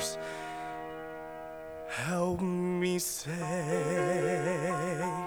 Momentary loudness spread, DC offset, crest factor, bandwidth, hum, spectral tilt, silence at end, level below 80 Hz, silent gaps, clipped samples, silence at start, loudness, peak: 13 LU; under 0.1%; 16 dB; over 20 kHz; none; -5 dB/octave; 0 s; -62 dBFS; none; under 0.1%; 0 s; -33 LUFS; -18 dBFS